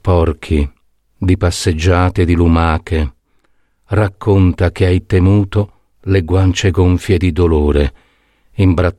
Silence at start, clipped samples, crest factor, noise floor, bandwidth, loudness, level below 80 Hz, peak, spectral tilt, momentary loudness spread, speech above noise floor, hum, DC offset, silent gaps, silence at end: 0.05 s; under 0.1%; 12 dB; -56 dBFS; 12 kHz; -14 LUFS; -24 dBFS; 0 dBFS; -7 dB/octave; 7 LU; 44 dB; none; under 0.1%; none; 0.05 s